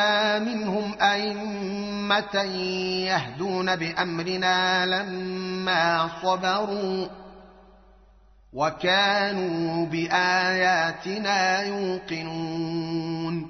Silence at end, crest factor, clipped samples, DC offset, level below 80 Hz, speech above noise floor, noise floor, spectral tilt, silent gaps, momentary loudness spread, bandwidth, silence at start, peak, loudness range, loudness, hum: 0 s; 18 dB; under 0.1%; under 0.1%; -60 dBFS; 29 dB; -55 dBFS; -2 dB/octave; none; 9 LU; 6.4 kHz; 0 s; -8 dBFS; 4 LU; -25 LUFS; none